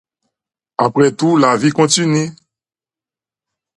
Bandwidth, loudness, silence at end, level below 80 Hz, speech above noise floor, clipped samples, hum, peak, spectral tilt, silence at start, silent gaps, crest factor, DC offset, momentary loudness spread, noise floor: 11.5 kHz; -14 LUFS; 1.45 s; -60 dBFS; over 77 dB; under 0.1%; none; 0 dBFS; -4.5 dB/octave; 0.8 s; none; 16 dB; under 0.1%; 8 LU; under -90 dBFS